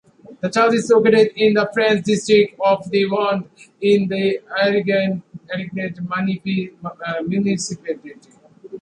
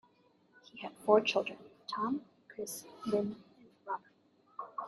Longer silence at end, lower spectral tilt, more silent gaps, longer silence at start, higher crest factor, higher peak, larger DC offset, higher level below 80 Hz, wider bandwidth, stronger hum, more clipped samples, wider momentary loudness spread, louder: about the same, 0 s vs 0 s; first, -5.5 dB/octave vs -4 dB/octave; neither; second, 0.3 s vs 0.75 s; second, 16 dB vs 26 dB; first, -2 dBFS vs -12 dBFS; neither; first, -62 dBFS vs -80 dBFS; second, 11 kHz vs 12.5 kHz; neither; neither; second, 14 LU vs 23 LU; first, -18 LUFS vs -35 LUFS